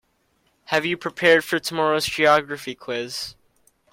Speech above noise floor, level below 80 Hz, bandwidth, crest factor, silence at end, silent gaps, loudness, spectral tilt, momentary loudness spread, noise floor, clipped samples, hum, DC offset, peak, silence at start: 45 dB; -60 dBFS; 16.5 kHz; 20 dB; 0.6 s; none; -21 LUFS; -3.5 dB/octave; 14 LU; -66 dBFS; under 0.1%; none; under 0.1%; -4 dBFS; 0.7 s